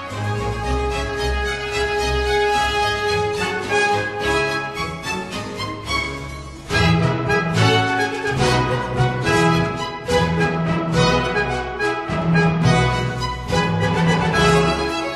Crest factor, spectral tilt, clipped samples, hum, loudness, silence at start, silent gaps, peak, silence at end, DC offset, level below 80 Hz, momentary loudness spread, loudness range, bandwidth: 16 dB; -5 dB/octave; under 0.1%; none; -19 LUFS; 0 s; none; -2 dBFS; 0 s; under 0.1%; -32 dBFS; 9 LU; 3 LU; 13 kHz